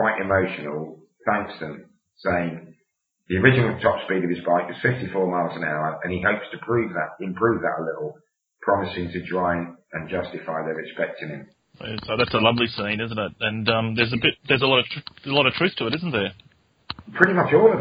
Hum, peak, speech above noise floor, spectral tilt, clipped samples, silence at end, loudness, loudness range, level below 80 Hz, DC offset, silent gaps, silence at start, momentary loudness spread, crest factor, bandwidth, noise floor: none; 0 dBFS; 50 dB; -8 dB/octave; under 0.1%; 0 s; -23 LUFS; 6 LU; -56 dBFS; under 0.1%; none; 0 s; 15 LU; 24 dB; 5.2 kHz; -73 dBFS